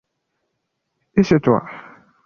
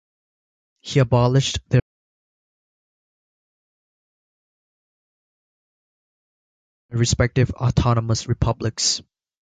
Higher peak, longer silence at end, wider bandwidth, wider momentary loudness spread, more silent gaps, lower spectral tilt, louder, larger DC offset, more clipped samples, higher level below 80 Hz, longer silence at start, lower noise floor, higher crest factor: about the same, -2 dBFS vs -4 dBFS; about the same, 0.45 s vs 0.4 s; second, 7 kHz vs 9.4 kHz; first, 21 LU vs 6 LU; second, none vs 1.82-6.89 s; first, -8 dB/octave vs -5 dB/octave; about the same, -18 LUFS vs -20 LUFS; neither; neither; second, -50 dBFS vs -38 dBFS; first, 1.15 s vs 0.85 s; second, -75 dBFS vs under -90 dBFS; about the same, 20 dB vs 20 dB